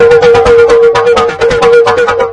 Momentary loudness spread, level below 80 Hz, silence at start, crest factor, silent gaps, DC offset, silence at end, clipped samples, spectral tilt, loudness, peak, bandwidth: 4 LU; -30 dBFS; 0 s; 6 dB; none; under 0.1%; 0 s; 2%; -4.5 dB/octave; -6 LUFS; 0 dBFS; 10 kHz